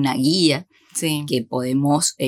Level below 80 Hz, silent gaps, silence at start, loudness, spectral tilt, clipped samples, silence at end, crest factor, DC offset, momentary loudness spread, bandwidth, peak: -70 dBFS; none; 0 s; -20 LUFS; -4 dB/octave; under 0.1%; 0 s; 16 dB; under 0.1%; 8 LU; 17.5 kHz; -4 dBFS